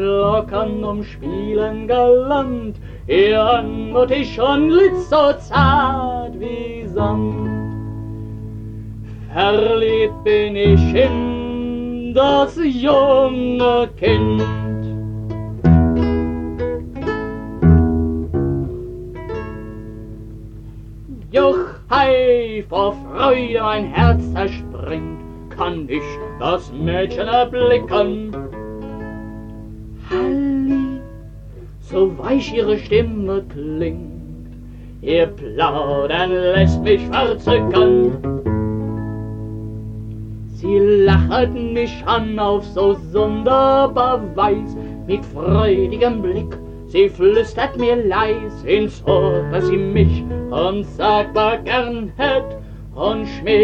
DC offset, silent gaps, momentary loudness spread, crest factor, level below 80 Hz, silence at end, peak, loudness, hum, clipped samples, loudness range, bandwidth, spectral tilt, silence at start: under 0.1%; none; 17 LU; 16 dB; -32 dBFS; 0 s; -2 dBFS; -17 LUFS; 50 Hz at -35 dBFS; under 0.1%; 6 LU; 7.4 kHz; -8 dB/octave; 0 s